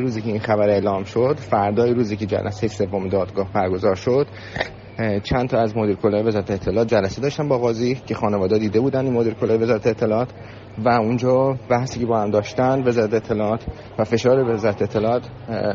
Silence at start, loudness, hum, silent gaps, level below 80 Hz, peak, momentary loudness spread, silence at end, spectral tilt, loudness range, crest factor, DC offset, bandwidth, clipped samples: 0 s; -20 LUFS; none; none; -46 dBFS; -4 dBFS; 7 LU; 0 s; -6.5 dB/octave; 2 LU; 16 dB; under 0.1%; 7.4 kHz; under 0.1%